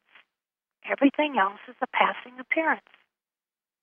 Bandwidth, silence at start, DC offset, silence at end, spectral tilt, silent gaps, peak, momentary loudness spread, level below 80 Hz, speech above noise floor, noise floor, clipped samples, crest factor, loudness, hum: 3.6 kHz; 0.85 s; under 0.1%; 1.05 s; -7 dB/octave; none; -6 dBFS; 11 LU; -88 dBFS; over 64 dB; under -90 dBFS; under 0.1%; 24 dB; -26 LUFS; none